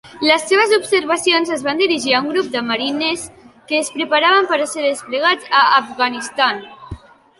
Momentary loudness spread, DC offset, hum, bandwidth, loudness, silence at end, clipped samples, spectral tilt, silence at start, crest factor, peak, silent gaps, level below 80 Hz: 8 LU; under 0.1%; none; 11.5 kHz; -16 LUFS; 0.45 s; under 0.1%; -2 dB/octave; 0.05 s; 16 dB; 0 dBFS; none; -52 dBFS